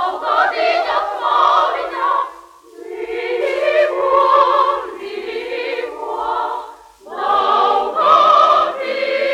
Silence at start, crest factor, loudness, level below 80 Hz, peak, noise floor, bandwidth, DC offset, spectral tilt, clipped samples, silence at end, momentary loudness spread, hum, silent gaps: 0 s; 16 dB; -16 LUFS; -56 dBFS; 0 dBFS; -39 dBFS; 13 kHz; under 0.1%; -2.5 dB/octave; under 0.1%; 0 s; 14 LU; none; none